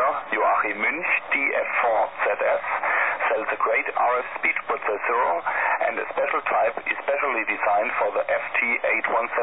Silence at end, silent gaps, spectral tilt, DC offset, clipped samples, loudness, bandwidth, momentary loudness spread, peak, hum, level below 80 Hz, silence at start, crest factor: 0 s; none; -6.5 dB/octave; 0.3%; under 0.1%; -23 LUFS; 4 kHz; 3 LU; -10 dBFS; none; -66 dBFS; 0 s; 12 dB